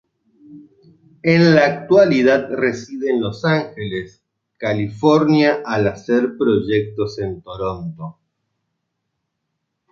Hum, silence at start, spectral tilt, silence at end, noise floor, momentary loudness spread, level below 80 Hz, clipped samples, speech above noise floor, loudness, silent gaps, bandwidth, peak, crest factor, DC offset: none; 0.5 s; -7 dB/octave; 1.8 s; -75 dBFS; 14 LU; -52 dBFS; under 0.1%; 59 dB; -17 LUFS; none; 7.4 kHz; -2 dBFS; 18 dB; under 0.1%